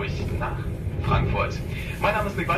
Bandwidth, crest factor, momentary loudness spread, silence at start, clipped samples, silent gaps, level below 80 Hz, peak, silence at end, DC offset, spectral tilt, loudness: 14.5 kHz; 18 dB; 7 LU; 0 s; under 0.1%; none; -34 dBFS; -8 dBFS; 0 s; under 0.1%; -6.5 dB/octave; -26 LUFS